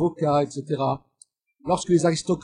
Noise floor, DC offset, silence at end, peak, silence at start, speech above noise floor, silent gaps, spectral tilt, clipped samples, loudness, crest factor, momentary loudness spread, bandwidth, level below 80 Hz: -58 dBFS; under 0.1%; 0 s; -8 dBFS; 0 s; 36 dB; none; -6 dB/octave; under 0.1%; -24 LUFS; 16 dB; 9 LU; 10.5 kHz; -56 dBFS